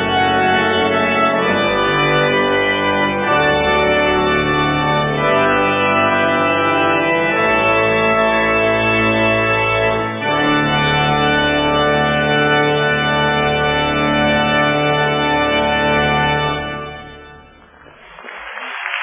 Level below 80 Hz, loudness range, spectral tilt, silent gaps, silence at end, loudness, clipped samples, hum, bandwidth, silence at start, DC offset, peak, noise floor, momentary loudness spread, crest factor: -38 dBFS; 2 LU; -9 dB/octave; none; 0 s; -14 LUFS; under 0.1%; none; 3.9 kHz; 0 s; under 0.1%; -2 dBFS; -43 dBFS; 3 LU; 12 dB